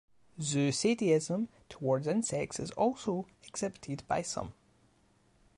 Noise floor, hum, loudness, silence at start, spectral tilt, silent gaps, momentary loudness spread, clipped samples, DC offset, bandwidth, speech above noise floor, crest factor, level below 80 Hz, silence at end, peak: -68 dBFS; none; -33 LUFS; 0.35 s; -5 dB/octave; none; 10 LU; under 0.1%; under 0.1%; 11.5 kHz; 36 dB; 18 dB; -64 dBFS; 1.05 s; -16 dBFS